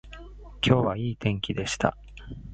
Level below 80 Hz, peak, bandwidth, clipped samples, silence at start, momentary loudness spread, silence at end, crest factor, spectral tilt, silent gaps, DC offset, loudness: -46 dBFS; -4 dBFS; 9.2 kHz; under 0.1%; 0.05 s; 23 LU; 0 s; 24 dB; -5.5 dB/octave; none; under 0.1%; -26 LUFS